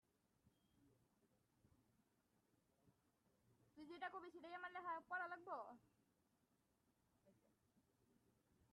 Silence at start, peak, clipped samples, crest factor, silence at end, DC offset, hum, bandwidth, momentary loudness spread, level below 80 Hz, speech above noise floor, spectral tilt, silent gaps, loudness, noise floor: 0.45 s; -38 dBFS; under 0.1%; 22 dB; 1.4 s; under 0.1%; none; 10 kHz; 12 LU; under -90 dBFS; 32 dB; -4.5 dB/octave; none; -53 LUFS; -85 dBFS